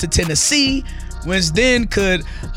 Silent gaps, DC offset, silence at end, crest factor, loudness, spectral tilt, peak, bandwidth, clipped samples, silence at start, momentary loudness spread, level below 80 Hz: none; under 0.1%; 0 s; 16 dB; -16 LUFS; -3 dB/octave; 0 dBFS; 16.5 kHz; under 0.1%; 0 s; 10 LU; -26 dBFS